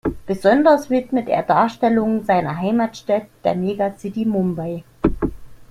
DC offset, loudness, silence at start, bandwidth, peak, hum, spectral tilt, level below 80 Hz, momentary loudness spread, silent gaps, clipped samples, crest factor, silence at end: under 0.1%; -19 LUFS; 0.05 s; 14.5 kHz; -2 dBFS; none; -7.5 dB/octave; -40 dBFS; 9 LU; none; under 0.1%; 16 dB; 0.05 s